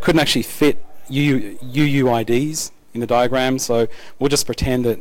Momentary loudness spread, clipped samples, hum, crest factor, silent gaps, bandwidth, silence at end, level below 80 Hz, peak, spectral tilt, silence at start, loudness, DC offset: 9 LU; under 0.1%; none; 14 dB; none; 17.5 kHz; 0 s; -38 dBFS; -4 dBFS; -4.5 dB/octave; 0 s; -19 LUFS; under 0.1%